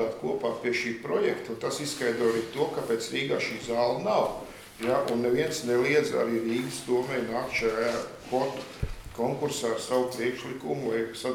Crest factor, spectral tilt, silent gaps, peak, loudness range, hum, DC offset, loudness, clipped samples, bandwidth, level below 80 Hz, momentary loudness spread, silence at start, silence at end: 18 dB; -4.5 dB/octave; none; -12 dBFS; 3 LU; none; under 0.1%; -29 LUFS; under 0.1%; 17.5 kHz; -52 dBFS; 6 LU; 0 s; 0 s